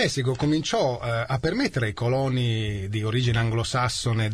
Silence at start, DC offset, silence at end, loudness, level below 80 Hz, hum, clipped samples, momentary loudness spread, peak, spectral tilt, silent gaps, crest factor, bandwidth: 0 s; 0.2%; 0 s; -25 LUFS; -46 dBFS; none; under 0.1%; 3 LU; -10 dBFS; -5.5 dB/octave; none; 14 dB; 13 kHz